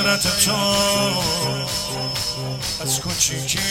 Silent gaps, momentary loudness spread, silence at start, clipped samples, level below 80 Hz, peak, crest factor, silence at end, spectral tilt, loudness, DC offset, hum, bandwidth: none; 7 LU; 0 s; under 0.1%; -42 dBFS; -2 dBFS; 18 dB; 0 s; -2.5 dB/octave; -19 LUFS; under 0.1%; none; 16.5 kHz